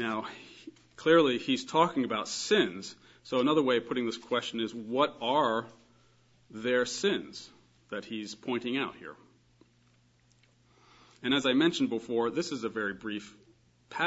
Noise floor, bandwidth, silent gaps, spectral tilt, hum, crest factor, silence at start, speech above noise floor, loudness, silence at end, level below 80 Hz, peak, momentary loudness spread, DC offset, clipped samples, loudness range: -66 dBFS; 8 kHz; none; -4 dB/octave; none; 22 dB; 0 s; 36 dB; -30 LUFS; 0 s; -74 dBFS; -10 dBFS; 19 LU; under 0.1%; under 0.1%; 10 LU